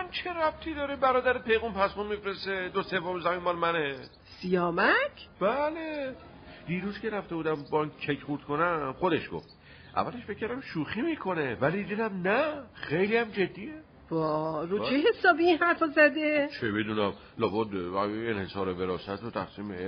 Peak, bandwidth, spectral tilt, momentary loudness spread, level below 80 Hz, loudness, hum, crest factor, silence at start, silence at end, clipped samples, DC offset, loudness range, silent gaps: -10 dBFS; 6.2 kHz; -3.5 dB/octave; 12 LU; -58 dBFS; -29 LUFS; none; 20 dB; 0 s; 0 s; under 0.1%; under 0.1%; 6 LU; none